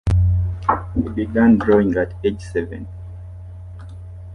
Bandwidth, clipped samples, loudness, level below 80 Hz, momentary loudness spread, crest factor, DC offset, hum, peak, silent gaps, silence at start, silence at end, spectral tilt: 10 kHz; under 0.1%; -19 LUFS; -30 dBFS; 22 LU; 16 dB; under 0.1%; none; -4 dBFS; none; 0.05 s; 0 s; -9 dB/octave